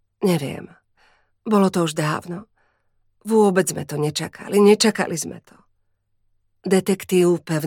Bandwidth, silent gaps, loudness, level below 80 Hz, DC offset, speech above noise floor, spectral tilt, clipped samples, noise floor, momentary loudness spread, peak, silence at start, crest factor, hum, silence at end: 17.5 kHz; none; -20 LUFS; -64 dBFS; under 0.1%; 48 dB; -5 dB/octave; under 0.1%; -67 dBFS; 18 LU; -2 dBFS; 0.2 s; 20 dB; none; 0 s